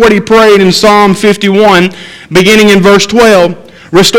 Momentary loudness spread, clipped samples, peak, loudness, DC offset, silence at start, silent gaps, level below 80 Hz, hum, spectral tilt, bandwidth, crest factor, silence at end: 8 LU; 8%; 0 dBFS; -5 LUFS; under 0.1%; 0 s; none; -34 dBFS; none; -4.5 dB/octave; 17 kHz; 4 dB; 0 s